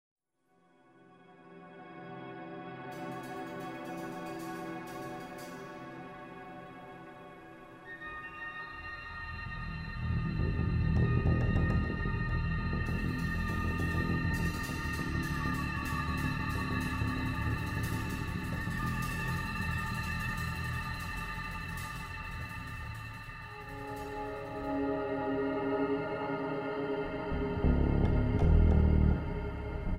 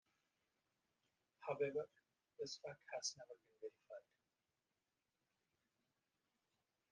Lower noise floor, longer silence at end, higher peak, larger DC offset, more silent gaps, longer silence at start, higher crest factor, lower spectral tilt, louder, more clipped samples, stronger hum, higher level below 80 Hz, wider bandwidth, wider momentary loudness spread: second, -72 dBFS vs under -90 dBFS; second, 0 s vs 2.9 s; first, -14 dBFS vs -30 dBFS; neither; neither; second, 1.1 s vs 1.4 s; about the same, 20 dB vs 24 dB; first, -7 dB/octave vs -2.5 dB/octave; first, -34 LUFS vs -49 LUFS; neither; neither; first, -40 dBFS vs under -90 dBFS; first, 16 kHz vs 8.8 kHz; about the same, 16 LU vs 17 LU